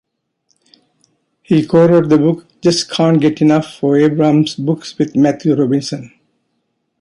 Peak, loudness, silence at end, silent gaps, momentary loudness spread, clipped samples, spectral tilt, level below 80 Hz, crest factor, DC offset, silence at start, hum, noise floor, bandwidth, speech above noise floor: -2 dBFS; -13 LUFS; 0.95 s; none; 8 LU; under 0.1%; -6.5 dB/octave; -56 dBFS; 14 dB; under 0.1%; 1.5 s; none; -68 dBFS; 11.5 kHz; 55 dB